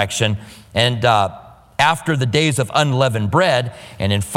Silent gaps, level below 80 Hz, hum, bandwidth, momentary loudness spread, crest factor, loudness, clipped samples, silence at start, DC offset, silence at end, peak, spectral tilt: none; -46 dBFS; none; 16.5 kHz; 9 LU; 18 dB; -17 LUFS; under 0.1%; 0 s; under 0.1%; 0 s; 0 dBFS; -4.5 dB/octave